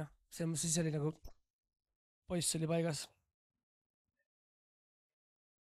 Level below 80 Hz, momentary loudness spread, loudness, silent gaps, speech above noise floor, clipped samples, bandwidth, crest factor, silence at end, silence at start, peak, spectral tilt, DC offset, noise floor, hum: -66 dBFS; 13 LU; -37 LUFS; 1.50-1.63 s, 1.96-2.22 s; over 53 dB; under 0.1%; 15 kHz; 20 dB; 2.6 s; 0 s; -22 dBFS; -4.5 dB/octave; under 0.1%; under -90 dBFS; none